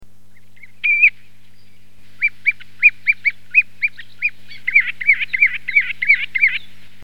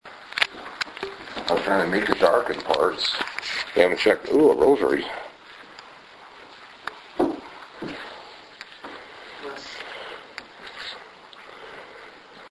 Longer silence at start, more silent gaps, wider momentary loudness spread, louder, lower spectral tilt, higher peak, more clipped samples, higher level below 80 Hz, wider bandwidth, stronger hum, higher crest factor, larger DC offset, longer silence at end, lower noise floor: about the same, 0 s vs 0.05 s; neither; second, 10 LU vs 25 LU; first, -15 LUFS vs -23 LUFS; second, -1.5 dB/octave vs -4 dB/octave; about the same, 0 dBFS vs -2 dBFS; neither; second, -64 dBFS vs -58 dBFS; first, 13 kHz vs 11 kHz; first, 50 Hz at -55 dBFS vs none; second, 18 dB vs 24 dB; first, 3% vs under 0.1%; first, 0.45 s vs 0 s; first, -53 dBFS vs -46 dBFS